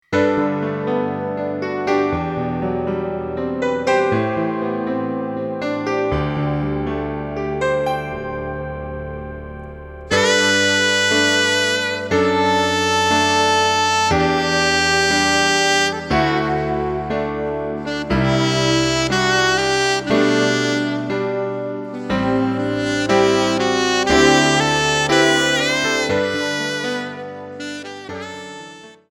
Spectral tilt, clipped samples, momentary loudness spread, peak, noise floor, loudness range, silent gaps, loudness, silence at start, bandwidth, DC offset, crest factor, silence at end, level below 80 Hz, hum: -3.5 dB/octave; under 0.1%; 13 LU; 0 dBFS; -39 dBFS; 7 LU; none; -18 LUFS; 0.1 s; 17.5 kHz; under 0.1%; 18 dB; 0.2 s; -40 dBFS; none